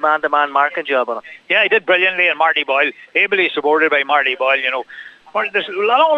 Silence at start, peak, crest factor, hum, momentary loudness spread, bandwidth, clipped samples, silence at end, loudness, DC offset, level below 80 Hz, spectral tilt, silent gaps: 0 s; -2 dBFS; 14 dB; none; 9 LU; 7.8 kHz; under 0.1%; 0 s; -15 LUFS; under 0.1%; -74 dBFS; -4 dB/octave; none